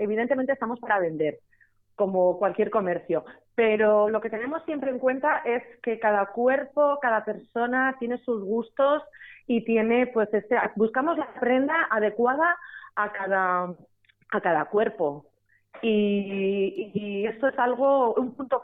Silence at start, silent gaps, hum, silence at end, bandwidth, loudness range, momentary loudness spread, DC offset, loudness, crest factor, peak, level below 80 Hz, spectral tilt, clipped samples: 0 s; none; none; 0 s; 3.9 kHz; 2 LU; 8 LU; under 0.1%; -25 LUFS; 14 dB; -12 dBFS; -68 dBFS; -9.5 dB/octave; under 0.1%